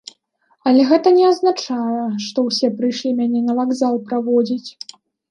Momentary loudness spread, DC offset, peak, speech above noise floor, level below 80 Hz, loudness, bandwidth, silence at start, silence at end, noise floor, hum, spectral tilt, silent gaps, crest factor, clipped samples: 10 LU; under 0.1%; -2 dBFS; 46 dB; -72 dBFS; -17 LUFS; 10 kHz; 0.65 s; 0.6 s; -62 dBFS; none; -5 dB/octave; none; 16 dB; under 0.1%